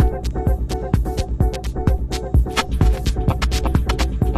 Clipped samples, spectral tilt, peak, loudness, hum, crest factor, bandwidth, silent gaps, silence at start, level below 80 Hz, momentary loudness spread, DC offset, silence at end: under 0.1%; -6 dB/octave; -2 dBFS; -21 LUFS; none; 16 dB; 14 kHz; none; 0 s; -20 dBFS; 4 LU; under 0.1%; 0 s